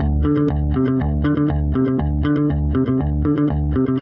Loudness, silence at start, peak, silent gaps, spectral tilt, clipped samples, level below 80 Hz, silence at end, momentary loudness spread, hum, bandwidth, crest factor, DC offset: -19 LUFS; 0 s; -6 dBFS; none; -11.5 dB/octave; under 0.1%; -24 dBFS; 0 s; 1 LU; none; 4 kHz; 12 dB; under 0.1%